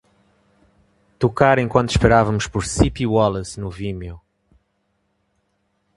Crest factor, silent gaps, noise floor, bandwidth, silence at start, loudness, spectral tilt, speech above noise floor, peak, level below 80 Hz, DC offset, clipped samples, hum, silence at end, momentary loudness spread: 20 dB; none; -69 dBFS; 11.5 kHz; 1.2 s; -19 LUFS; -5.5 dB/octave; 51 dB; 0 dBFS; -36 dBFS; under 0.1%; under 0.1%; none; 1.8 s; 14 LU